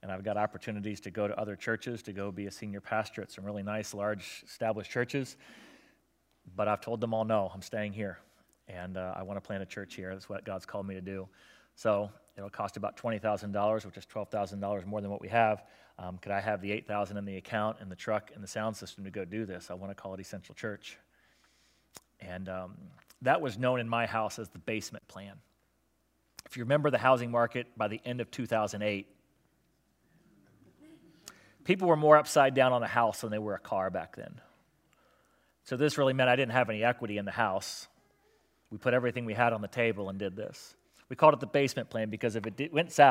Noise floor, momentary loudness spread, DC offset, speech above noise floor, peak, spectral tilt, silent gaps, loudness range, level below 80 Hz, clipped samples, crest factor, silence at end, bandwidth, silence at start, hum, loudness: -74 dBFS; 17 LU; under 0.1%; 42 dB; -6 dBFS; -5.5 dB/octave; none; 11 LU; -76 dBFS; under 0.1%; 26 dB; 0 s; 16 kHz; 0.05 s; none; -32 LUFS